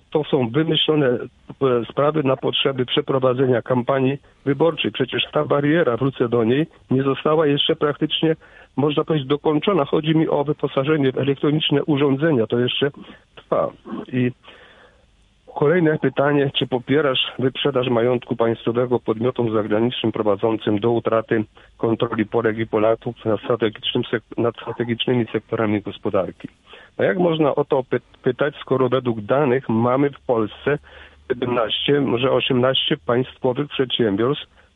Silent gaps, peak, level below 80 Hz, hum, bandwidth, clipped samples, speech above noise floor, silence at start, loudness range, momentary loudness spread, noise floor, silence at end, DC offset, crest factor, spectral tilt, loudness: none; -4 dBFS; -56 dBFS; none; 4 kHz; under 0.1%; 37 dB; 0.1 s; 3 LU; 6 LU; -56 dBFS; 0.3 s; under 0.1%; 16 dB; -9 dB/octave; -20 LUFS